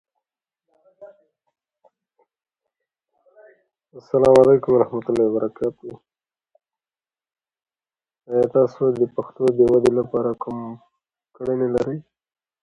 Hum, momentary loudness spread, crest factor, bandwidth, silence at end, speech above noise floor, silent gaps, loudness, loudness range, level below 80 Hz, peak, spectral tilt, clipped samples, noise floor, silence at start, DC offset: none; 16 LU; 22 dB; 11 kHz; 0.6 s; over 71 dB; none; -19 LUFS; 8 LU; -56 dBFS; 0 dBFS; -8 dB/octave; under 0.1%; under -90 dBFS; 1 s; under 0.1%